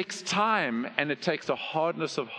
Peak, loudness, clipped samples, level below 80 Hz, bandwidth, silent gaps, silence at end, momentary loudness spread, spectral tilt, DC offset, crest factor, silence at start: -6 dBFS; -28 LUFS; under 0.1%; -74 dBFS; 11.5 kHz; none; 0 s; 5 LU; -4 dB/octave; under 0.1%; 22 dB; 0 s